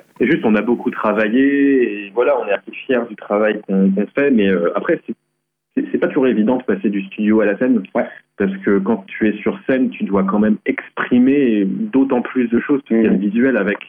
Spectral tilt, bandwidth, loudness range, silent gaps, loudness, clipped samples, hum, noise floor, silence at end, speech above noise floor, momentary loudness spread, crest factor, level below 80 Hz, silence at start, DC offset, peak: -10 dB/octave; 3.7 kHz; 2 LU; none; -17 LUFS; under 0.1%; none; -73 dBFS; 0.1 s; 57 dB; 7 LU; 10 dB; -58 dBFS; 0.2 s; under 0.1%; -6 dBFS